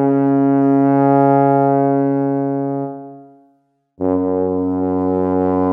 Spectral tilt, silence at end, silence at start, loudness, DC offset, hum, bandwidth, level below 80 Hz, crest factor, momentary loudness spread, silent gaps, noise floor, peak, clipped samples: -12.5 dB/octave; 0 s; 0 s; -16 LUFS; under 0.1%; none; 2.9 kHz; -58 dBFS; 14 dB; 9 LU; none; -60 dBFS; -2 dBFS; under 0.1%